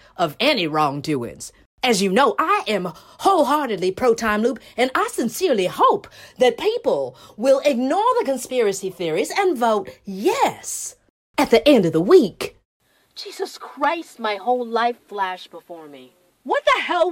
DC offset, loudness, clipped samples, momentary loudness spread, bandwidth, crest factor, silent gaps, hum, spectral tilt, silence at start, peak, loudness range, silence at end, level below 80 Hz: under 0.1%; -20 LUFS; under 0.1%; 15 LU; 16.5 kHz; 20 dB; 1.66-1.78 s, 11.10-11.34 s, 12.65-12.80 s; none; -4 dB/octave; 0.2 s; 0 dBFS; 6 LU; 0 s; -56 dBFS